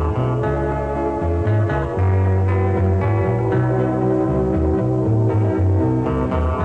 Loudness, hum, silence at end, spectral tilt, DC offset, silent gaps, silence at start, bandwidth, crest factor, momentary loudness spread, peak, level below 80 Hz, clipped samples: -19 LUFS; none; 0 s; -10 dB/octave; 0.4%; none; 0 s; 4.2 kHz; 10 dB; 3 LU; -6 dBFS; -30 dBFS; under 0.1%